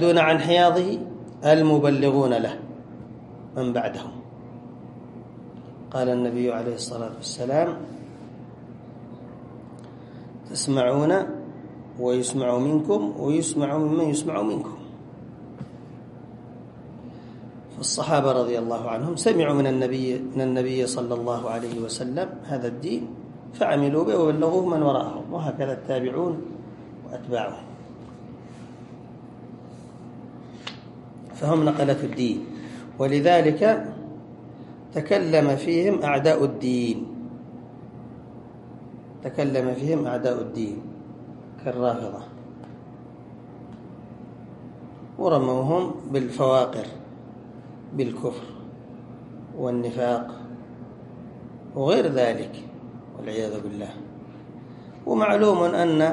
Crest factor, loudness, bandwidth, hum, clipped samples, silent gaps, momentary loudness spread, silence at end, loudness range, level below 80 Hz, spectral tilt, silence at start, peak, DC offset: 20 dB; -24 LUFS; 11.5 kHz; none; under 0.1%; none; 22 LU; 0 s; 11 LU; -62 dBFS; -6 dB/octave; 0 s; -4 dBFS; under 0.1%